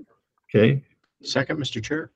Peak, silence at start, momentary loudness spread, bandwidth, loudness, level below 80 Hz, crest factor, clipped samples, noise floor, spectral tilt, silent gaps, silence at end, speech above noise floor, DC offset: -6 dBFS; 0.55 s; 9 LU; 8.4 kHz; -23 LUFS; -58 dBFS; 20 dB; under 0.1%; -55 dBFS; -6 dB/octave; none; 0.1 s; 33 dB; under 0.1%